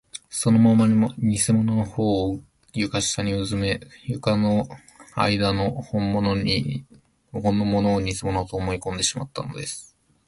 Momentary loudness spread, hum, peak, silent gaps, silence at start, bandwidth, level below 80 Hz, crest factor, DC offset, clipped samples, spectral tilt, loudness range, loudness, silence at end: 13 LU; none; -6 dBFS; none; 0.15 s; 11.5 kHz; -44 dBFS; 16 dB; under 0.1%; under 0.1%; -5 dB/octave; 4 LU; -23 LUFS; 0.45 s